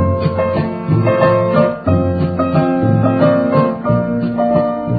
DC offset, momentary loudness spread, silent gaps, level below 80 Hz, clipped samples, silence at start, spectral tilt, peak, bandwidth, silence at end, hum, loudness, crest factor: under 0.1%; 4 LU; none; -32 dBFS; under 0.1%; 0 s; -12.5 dB/octave; 0 dBFS; 4.9 kHz; 0 s; none; -14 LUFS; 14 dB